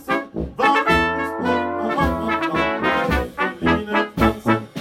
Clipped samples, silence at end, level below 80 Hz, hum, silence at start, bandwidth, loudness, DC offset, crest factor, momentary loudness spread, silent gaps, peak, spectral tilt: under 0.1%; 0 s; -34 dBFS; none; 0 s; 16 kHz; -20 LUFS; under 0.1%; 14 dB; 5 LU; none; -6 dBFS; -6 dB/octave